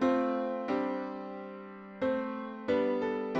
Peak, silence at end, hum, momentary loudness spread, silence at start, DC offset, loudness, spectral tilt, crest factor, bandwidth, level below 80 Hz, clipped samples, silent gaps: -18 dBFS; 0 s; none; 14 LU; 0 s; under 0.1%; -33 LUFS; -7 dB/octave; 16 dB; 7.2 kHz; -70 dBFS; under 0.1%; none